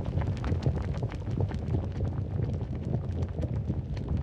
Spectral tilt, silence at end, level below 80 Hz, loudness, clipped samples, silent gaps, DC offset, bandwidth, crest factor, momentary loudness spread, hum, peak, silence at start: -9 dB/octave; 0 s; -40 dBFS; -32 LUFS; under 0.1%; none; under 0.1%; 7.8 kHz; 14 dB; 3 LU; none; -16 dBFS; 0 s